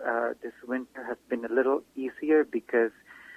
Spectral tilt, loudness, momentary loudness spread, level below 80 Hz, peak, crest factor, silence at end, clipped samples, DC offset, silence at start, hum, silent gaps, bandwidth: -6.5 dB/octave; -29 LUFS; 12 LU; -74 dBFS; -12 dBFS; 18 dB; 0 s; under 0.1%; under 0.1%; 0 s; none; none; 8.4 kHz